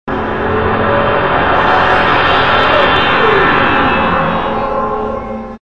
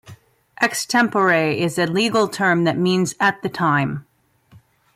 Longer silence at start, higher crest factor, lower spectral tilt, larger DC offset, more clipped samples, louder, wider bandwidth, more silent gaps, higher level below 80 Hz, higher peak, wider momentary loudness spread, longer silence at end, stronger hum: about the same, 0.05 s vs 0.1 s; about the same, 12 dB vs 16 dB; first, -6.5 dB/octave vs -4.5 dB/octave; first, 4% vs under 0.1%; neither; first, -11 LUFS vs -19 LUFS; second, 8.6 kHz vs 15.5 kHz; neither; first, -32 dBFS vs -62 dBFS; first, 0 dBFS vs -6 dBFS; first, 8 LU vs 5 LU; second, 0 s vs 0.95 s; neither